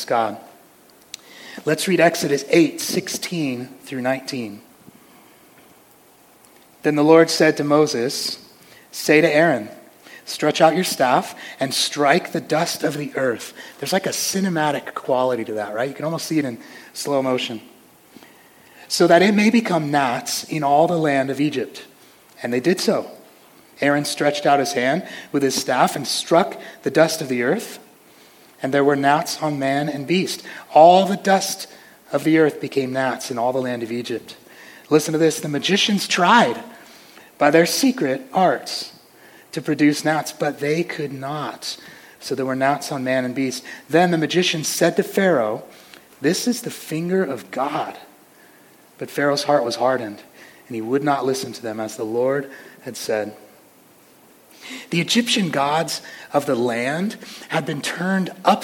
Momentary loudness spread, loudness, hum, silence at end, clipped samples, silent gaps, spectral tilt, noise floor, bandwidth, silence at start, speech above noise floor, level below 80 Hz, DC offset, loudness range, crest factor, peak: 15 LU; -20 LUFS; none; 0 s; under 0.1%; none; -4 dB/octave; -51 dBFS; 17.5 kHz; 0 s; 32 dB; -70 dBFS; under 0.1%; 7 LU; 20 dB; 0 dBFS